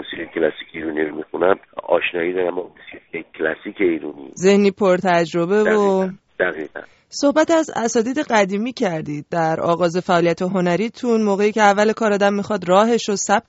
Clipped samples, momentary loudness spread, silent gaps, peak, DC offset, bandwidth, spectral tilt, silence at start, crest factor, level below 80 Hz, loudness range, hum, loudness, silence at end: under 0.1%; 11 LU; none; 0 dBFS; under 0.1%; 8 kHz; -4.5 dB/octave; 0 s; 18 dB; -58 dBFS; 5 LU; none; -19 LUFS; 0.1 s